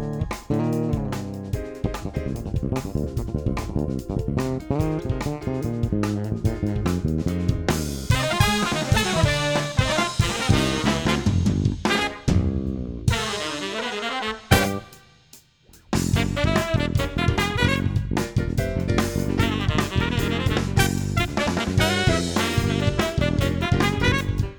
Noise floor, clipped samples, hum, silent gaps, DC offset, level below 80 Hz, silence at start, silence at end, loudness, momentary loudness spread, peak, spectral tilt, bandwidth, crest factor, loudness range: -53 dBFS; under 0.1%; none; none; under 0.1%; -34 dBFS; 0 s; 0 s; -23 LUFS; 7 LU; -2 dBFS; -5 dB/octave; over 20 kHz; 22 dB; 5 LU